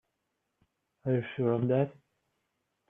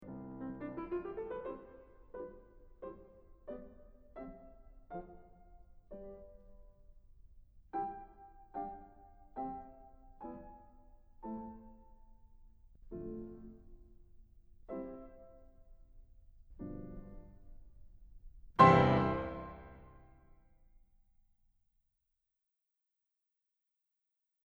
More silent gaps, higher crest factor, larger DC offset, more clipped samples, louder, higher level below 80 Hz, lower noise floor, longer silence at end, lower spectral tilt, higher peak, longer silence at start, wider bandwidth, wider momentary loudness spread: neither; second, 18 dB vs 30 dB; neither; neither; first, -31 LUFS vs -36 LUFS; second, -74 dBFS vs -58 dBFS; second, -82 dBFS vs -88 dBFS; second, 1 s vs 4.4 s; first, -11 dB/octave vs -8 dB/octave; second, -16 dBFS vs -10 dBFS; first, 1.05 s vs 0 s; second, 3.7 kHz vs 7.8 kHz; second, 7 LU vs 23 LU